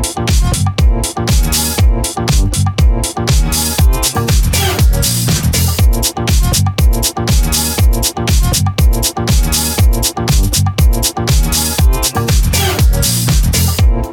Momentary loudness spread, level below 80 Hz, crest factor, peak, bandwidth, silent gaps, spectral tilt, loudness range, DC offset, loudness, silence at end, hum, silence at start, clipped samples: 3 LU; -14 dBFS; 10 dB; -2 dBFS; 19.5 kHz; none; -4 dB/octave; 1 LU; under 0.1%; -13 LUFS; 0 s; none; 0 s; under 0.1%